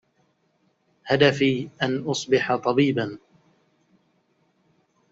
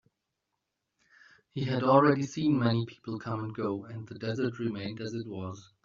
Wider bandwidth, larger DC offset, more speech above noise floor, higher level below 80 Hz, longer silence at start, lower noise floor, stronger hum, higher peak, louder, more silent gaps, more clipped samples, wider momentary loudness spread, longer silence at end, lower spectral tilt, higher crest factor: about the same, 8 kHz vs 7.4 kHz; neither; second, 46 dB vs 54 dB; about the same, -64 dBFS vs -68 dBFS; second, 1.05 s vs 1.55 s; second, -68 dBFS vs -84 dBFS; neither; first, -4 dBFS vs -8 dBFS; first, -22 LUFS vs -30 LUFS; neither; neither; second, 12 LU vs 16 LU; first, 1.95 s vs 0.2 s; second, -4 dB/octave vs -6 dB/octave; about the same, 22 dB vs 24 dB